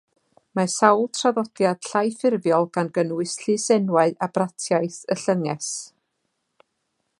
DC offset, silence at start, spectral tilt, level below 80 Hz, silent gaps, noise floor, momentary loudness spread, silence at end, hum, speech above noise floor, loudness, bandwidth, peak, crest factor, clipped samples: under 0.1%; 0.55 s; -4.5 dB/octave; -74 dBFS; none; -75 dBFS; 8 LU; 1.35 s; none; 54 dB; -22 LUFS; 11.5 kHz; -2 dBFS; 22 dB; under 0.1%